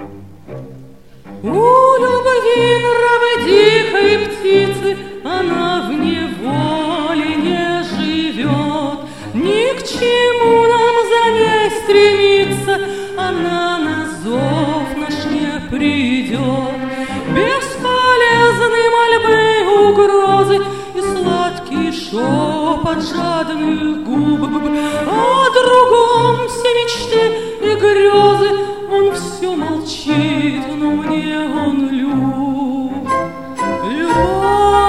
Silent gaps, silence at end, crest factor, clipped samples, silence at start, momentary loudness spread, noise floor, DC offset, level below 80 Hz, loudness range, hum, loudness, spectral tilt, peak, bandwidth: none; 0 s; 14 dB; under 0.1%; 0 s; 10 LU; -39 dBFS; 0.8%; -42 dBFS; 6 LU; none; -14 LUFS; -5 dB/octave; 0 dBFS; 13.5 kHz